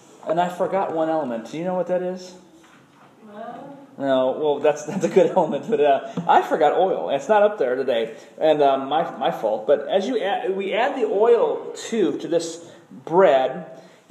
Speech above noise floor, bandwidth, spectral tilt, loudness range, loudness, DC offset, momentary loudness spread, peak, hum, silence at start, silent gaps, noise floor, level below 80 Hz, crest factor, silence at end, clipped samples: 30 dB; 13 kHz; -5.5 dB/octave; 7 LU; -21 LUFS; under 0.1%; 14 LU; -4 dBFS; none; 0.25 s; none; -51 dBFS; -80 dBFS; 18 dB; 0.3 s; under 0.1%